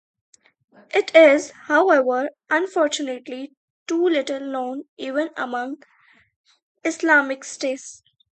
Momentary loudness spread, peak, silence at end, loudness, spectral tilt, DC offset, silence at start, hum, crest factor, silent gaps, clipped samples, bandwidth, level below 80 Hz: 17 LU; 0 dBFS; 0.4 s; -20 LUFS; -1.5 dB/octave; under 0.1%; 0.95 s; none; 22 dB; 3.57-3.86 s, 4.89-4.97 s, 6.36-6.44 s, 6.63-6.75 s; under 0.1%; 9 kHz; -78 dBFS